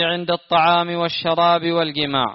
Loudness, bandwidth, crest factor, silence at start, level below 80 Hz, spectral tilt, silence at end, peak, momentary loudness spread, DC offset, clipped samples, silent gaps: -18 LUFS; 6 kHz; 14 dB; 0 s; -56 dBFS; -2.5 dB/octave; 0 s; -4 dBFS; 5 LU; under 0.1%; under 0.1%; none